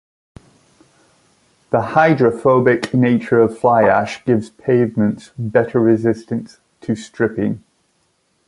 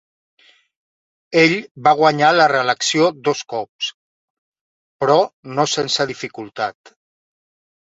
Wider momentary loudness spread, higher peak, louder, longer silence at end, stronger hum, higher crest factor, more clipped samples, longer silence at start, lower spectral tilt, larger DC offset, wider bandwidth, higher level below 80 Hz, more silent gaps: about the same, 11 LU vs 13 LU; about the same, 0 dBFS vs 0 dBFS; about the same, -16 LUFS vs -17 LUFS; second, 0.9 s vs 1.2 s; neither; about the same, 18 dB vs 18 dB; neither; first, 1.7 s vs 1.3 s; first, -7.5 dB/octave vs -3.5 dB/octave; neither; first, 11.5 kHz vs 8 kHz; first, -54 dBFS vs -64 dBFS; second, none vs 1.71-1.75 s, 3.69-3.79 s, 3.94-4.52 s, 4.61-4.99 s, 5.33-5.43 s